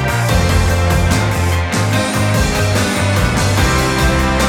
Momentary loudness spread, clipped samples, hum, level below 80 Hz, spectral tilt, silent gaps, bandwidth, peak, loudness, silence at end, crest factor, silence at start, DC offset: 2 LU; under 0.1%; none; -22 dBFS; -5 dB/octave; none; 18 kHz; -2 dBFS; -14 LUFS; 0 s; 12 dB; 0 s; under 0.1%